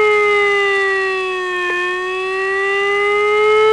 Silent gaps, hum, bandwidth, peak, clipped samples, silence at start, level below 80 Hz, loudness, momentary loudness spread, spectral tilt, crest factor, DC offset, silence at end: none; none; 10.5 kHz; -4 dBFS; under 0.1%; 0 s; -56 dBFS; -15 LUFS; 6 LU; -2.5 dB/octave; 12 dB; 0.2%; 0 s